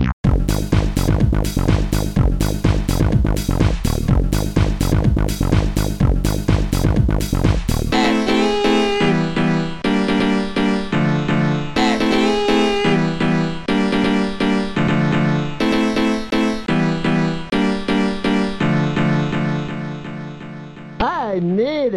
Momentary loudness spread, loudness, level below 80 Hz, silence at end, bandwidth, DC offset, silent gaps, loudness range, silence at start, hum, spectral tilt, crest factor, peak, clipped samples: 4 LU; -18 LUFS; -24 dBFS; 0 s; 17 kHz; under 0.1%; 0.13-0.24 s; 2 LU; 0 s; none; -6.5 dB/octave; 14 dB; -2 dBFS; under 0.1%